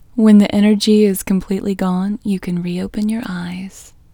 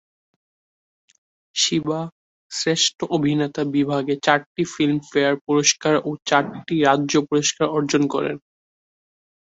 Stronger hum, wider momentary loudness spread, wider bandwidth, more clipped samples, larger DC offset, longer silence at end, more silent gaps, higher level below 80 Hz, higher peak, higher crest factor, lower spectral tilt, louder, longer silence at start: neither; first, 14 LU vs 9 LU; first, 17.5 kHz vs 8.2 kHz; neither; neither; second, 0.3 s vs 1.15 s; second, none vs 2.12-2.50 s, 4.46-4.55 s, 5.41-5.45 s; first, -44 dBFS vs -62 dBFS; about the same, 0 dBFS vs -2 dBFS; about the same, 16 dB vs 20 dB; first, -6.5 dB/octave vs -3.5 dB/octave; first, -16 LUFS vs -20 LUFS; second, 0.15 s vs 1.55 s